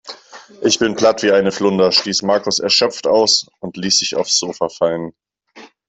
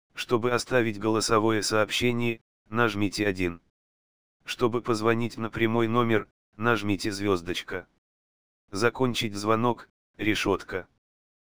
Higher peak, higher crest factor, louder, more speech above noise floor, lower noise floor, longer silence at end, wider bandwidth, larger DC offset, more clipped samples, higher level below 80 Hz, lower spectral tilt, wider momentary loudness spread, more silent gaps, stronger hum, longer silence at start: first, 0 dBFS vs -6 dBFS; second, 16 dB vs 22 dB; first, -15 LUFS vs -27 LUFS; second, 27 dB vs over 64 dB; second, -43 dBFS vs under -90 dBFS; second, 0.25 s vs 0.55 s; second, 8.4 kHz vs over 20 kHz; second, under 0.1% vs 0.7%; neither; about the same, -58 dBFS vs -56 dBFS; second, -2.5 dB/octave vs -5 dB/octave; about the same, 12 LU vs 13 LU; second, none vs 2.41-2.65 s, 3.70-4.40 s, 6.31-6.53 s, 7.98-8.68 s, 9.90-10.14 s; neither; about the same, 0.05 s vs 0.1 s